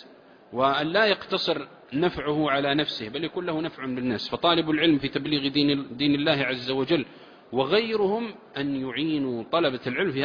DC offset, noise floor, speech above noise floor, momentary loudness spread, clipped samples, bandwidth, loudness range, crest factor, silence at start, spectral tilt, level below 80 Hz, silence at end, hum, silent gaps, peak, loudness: under 0.1%; -51 dBFS; 26 dB; 8 LU; under 0.1%; 5.2 kHz; 3 LU; 18 dB; 0 s; -6.5 dB/octave; -60 dBFS; 0 s; none; none; -8 dBFS; -25 LUFS